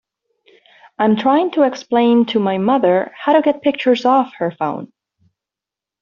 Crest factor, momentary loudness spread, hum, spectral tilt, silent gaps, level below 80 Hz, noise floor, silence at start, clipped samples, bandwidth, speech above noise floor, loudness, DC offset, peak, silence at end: 14 dB; 7 LU; none; -4.5 dB/octave; none; -64 dBFS; -87 dBFS; 1 s; under 0.1%; 7 kHz; 72 dB; -16 LUFS; under 0.1%; -2 dBFS; 1.15 s